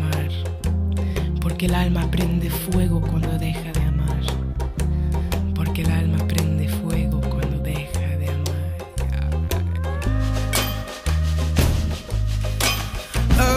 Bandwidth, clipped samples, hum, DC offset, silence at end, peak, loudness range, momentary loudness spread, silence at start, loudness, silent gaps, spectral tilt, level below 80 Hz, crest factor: 16 kHz; under 0.1%; none; under 0.1%; 0 s; -6 dBFS; 2 LU; 5 LU; 0 s; -23 LUFS; none; -5.5 dB/octave; -26 dBFS; 16 dB